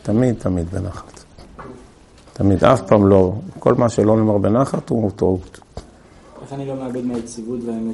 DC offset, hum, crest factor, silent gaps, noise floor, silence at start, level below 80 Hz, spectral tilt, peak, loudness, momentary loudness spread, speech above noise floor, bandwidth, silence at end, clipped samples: under 0.1%; none; 18 dB; none; -46 dBFS; 0.05 s; -46 dBFS; -8 dB/octave; 0 dBFS; -18 LUFS; 24 LU; 28 dB; 11.5 kHz; 0 s; under 0.1%